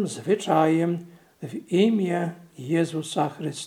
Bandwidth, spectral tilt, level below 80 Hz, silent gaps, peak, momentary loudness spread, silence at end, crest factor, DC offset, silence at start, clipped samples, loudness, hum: 14.5 kHz; -6 dB/octave; -74 dBFS; none; -6 dBFS; 16 LU; 0 s; 18 dB; under 0.1%; 0 s; under 0.1%; -24 LUFS; none